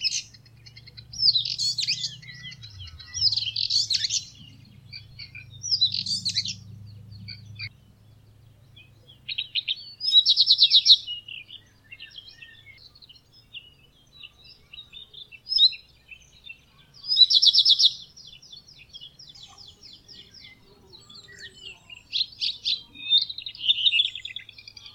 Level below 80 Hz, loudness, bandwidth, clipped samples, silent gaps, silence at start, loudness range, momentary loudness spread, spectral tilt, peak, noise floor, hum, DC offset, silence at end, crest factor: -62 dBFS; -20 LUFS; 16 kHz; under 0.1%; none; 0 s; 14 LU; 27 LU; 1 dB/octave; -4 dBFS; -56 dBFS; none; under 0.1%; 0.05 s; 24 dB